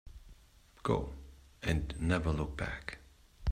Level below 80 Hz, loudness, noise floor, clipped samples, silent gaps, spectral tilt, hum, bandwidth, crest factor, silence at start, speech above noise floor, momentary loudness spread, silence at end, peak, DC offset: -46 dBFS; -36 LUFS; -61 dBFS; under 0.1%; none; -6.5 dB/octave; none; 14.5 kHz; 22 dB; 0.05 s; 28 dB; 19 LU; 0 s; -16 dBFS; under 0.1%